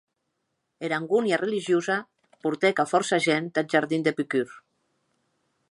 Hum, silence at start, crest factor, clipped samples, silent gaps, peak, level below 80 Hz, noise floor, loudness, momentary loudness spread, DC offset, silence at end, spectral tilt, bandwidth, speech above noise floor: none; 0.8 s; 20 dB; under 0.1%; none; -6 dBFS; -76 dBFS; -78 dBFS; -25 LUFS; 7 LU; under 0.1%; 1.1 s; -4.5 dB/octave; 11.5 kHz; 54 dB